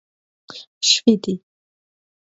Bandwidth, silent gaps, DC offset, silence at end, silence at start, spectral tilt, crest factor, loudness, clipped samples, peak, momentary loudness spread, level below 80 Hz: 7.8 kHz; 0.67-0.81 s; under 0.1%; 0.95 s; 0.5 s; -3 dB/octave; 22 dB; -17 LUFS; under 0.1%; -2 dBFS; 23 LU; -68 dBFS